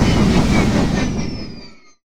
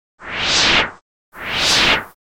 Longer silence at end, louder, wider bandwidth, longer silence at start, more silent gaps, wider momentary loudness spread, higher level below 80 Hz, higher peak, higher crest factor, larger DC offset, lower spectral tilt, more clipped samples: about the same, 0.15 s vs 0.2 s; about the same, -17 LUFS vs -15 LUFS; second, 14.5 kHz vs 17 kHz; second, 0 s vs 0.2 s; second, none vs 1.02-1.32 s; first, 17 LU vs 13 LU; first, -26 dBFS vs -40 dBFS; about the same, -2 dBFS vs -2 dBFS; about the same, 16 dB vs 16 dB; neither; first, -6 dB/octave vs -1 dB/octave; neither